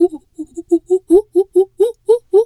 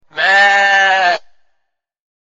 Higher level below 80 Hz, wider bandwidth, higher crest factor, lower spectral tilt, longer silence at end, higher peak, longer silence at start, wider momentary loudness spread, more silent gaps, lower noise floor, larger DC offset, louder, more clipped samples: first, -50 dBFS vs -66 dBFS; first, 12 kHz vs 8 kHz; about the same, 14 dB vs 14 dB; first, -6.5 dB/octave vs 0 dB/octave; second, 0 s vs 1.2 s; about the same, -2 dBFS vs 0 dBFS; second, 0 s vs 0.15 s; first, 17 LU vs 7 LU; neither; second, -31 dBFS vs -69 dBFS; neither; second, -15 LUFS vs -10 LUFS; neither